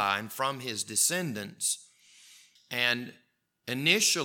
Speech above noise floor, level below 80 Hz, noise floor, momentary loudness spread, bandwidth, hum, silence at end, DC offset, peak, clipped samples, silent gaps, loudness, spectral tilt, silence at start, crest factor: 28 dB; -84 dBFS; -58 dBFS; 12 LU; 19 kHz; none; 0 s; under 0.1%; -8 dBFS; under 0.1%; none; -28 LUFS; -1.5 dB/octave; 0 s; 22 dB